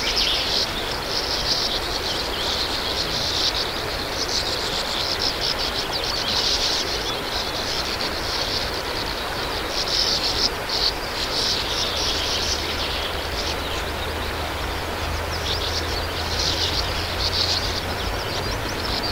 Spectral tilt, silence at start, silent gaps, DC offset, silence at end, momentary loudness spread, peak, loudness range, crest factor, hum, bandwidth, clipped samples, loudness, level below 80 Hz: -2.5 dB/octave; 0 s; none; under 0.1%; 0 s; 6 LU; -6 dBFS; 3 LU; 18 dB; none; 16 kHz; under 0.1%; -22 LUFS; -36 dBFS